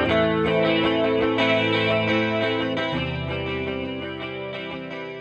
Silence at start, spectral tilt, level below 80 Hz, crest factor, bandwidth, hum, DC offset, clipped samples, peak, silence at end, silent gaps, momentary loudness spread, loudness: 0 s; -7 dB/octave; -46 dBFS; 14 dB; 8.4 kHz; none; under 0.1%; under 0.1%; -8 dBFS; 0 s; none; 11 LU; -23 LUFS